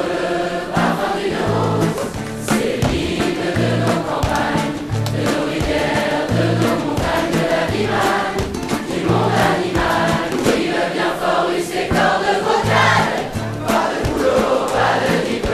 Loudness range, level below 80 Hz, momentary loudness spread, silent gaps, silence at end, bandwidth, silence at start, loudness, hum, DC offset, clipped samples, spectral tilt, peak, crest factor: 2 LU; -36 dBFS; 5 LU; none; 0 s; 14 kHz; 0 s; -18 LUFS; none; under 0.1%; under 0.1%; -5 dB/octave; 0 dBFS; 16 dB